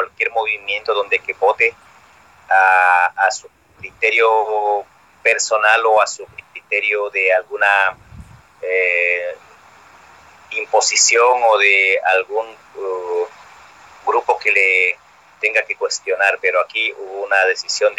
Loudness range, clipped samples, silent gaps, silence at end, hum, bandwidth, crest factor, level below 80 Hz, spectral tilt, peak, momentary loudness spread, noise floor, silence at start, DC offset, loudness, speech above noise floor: 3 LU; under 0.1%; none; 0.05 s; none; 12 kHz; 18 dB; -60 dBFS; 0.5 dB/octave; 0 dBFS; 14 LU; -48 dBFS; 0 s; under 0.1%; -16 LUFS; 32 dB